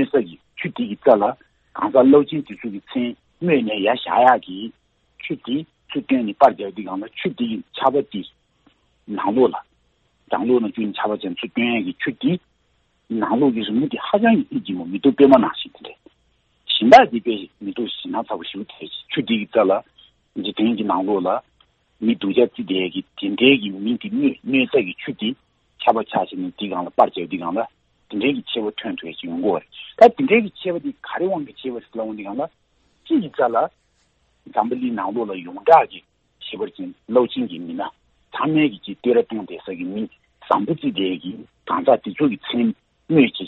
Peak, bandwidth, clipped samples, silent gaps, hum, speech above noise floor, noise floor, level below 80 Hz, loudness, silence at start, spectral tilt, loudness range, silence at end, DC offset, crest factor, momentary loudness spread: 0 dBFS; 7.6 kHz; under 0.1%; none; none; 45 dB; -64 dBFS; -62 dBFS; -20 LUFS; 0 s; -7 dB/octave; 5 LU; 0 s; under 0.1%; 20 dB; 16 LU